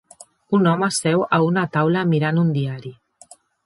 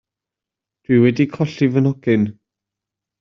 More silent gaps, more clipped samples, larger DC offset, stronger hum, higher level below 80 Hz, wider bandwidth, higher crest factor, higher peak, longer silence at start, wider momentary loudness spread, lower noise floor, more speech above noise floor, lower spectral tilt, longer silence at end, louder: neither; neither; neither; neither; second, -64 dBFS vs -58 dBFS; first, 11.5 kHz vs 7 kHz; about the same, 16 dB vs 16 dB; about the same, -4 dBFS vs -2 dBFS; second, 0.5 s vs 0.9 s; first, 8 LU vs 5 LU; second, -50 dBFS vs -86 dBFS; second, 31 dB vs 70 dB; second, -6 dB/octave vs -8 dB/octave; second, 0.7 s vs 0.9 s; about the same, -19 LUFS vs -17 LUFS